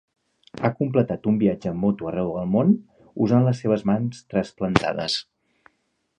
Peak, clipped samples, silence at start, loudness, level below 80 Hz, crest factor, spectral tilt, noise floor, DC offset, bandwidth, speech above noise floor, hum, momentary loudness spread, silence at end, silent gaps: 0 dBFS; under 0.1%; 0.55 s; -23 LUFS; -52 dBFS; 22 dB; -7 dB/octave; -71 dBFS; under 0.1%; 10 kHz; 50 dB; none; 7 LU; 0.95 s; none